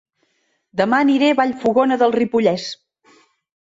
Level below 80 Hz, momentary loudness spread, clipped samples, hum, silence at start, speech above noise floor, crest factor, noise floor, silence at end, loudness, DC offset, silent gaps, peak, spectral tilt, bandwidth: -62 dBFS; 13 LU; under 0.1%; none; 0.75 s; 50 dB; 16 dB; -66 dBFS; 0.95 s; -17 LUFS; under 0.1%; none; -2 dBFS; -5.5 dB/octave; 7.8 kHz